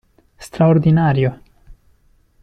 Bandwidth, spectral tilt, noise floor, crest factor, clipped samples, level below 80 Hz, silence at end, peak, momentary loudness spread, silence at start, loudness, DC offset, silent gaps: 11 kHz; -8.5 dB/octave; -55 dBFS; 14 dB; under 0.1%; -46 dBFS; 0.7 s; -4 dBFS; 9 LU; 0.4 s; -15 LUFS; under 0.1%; none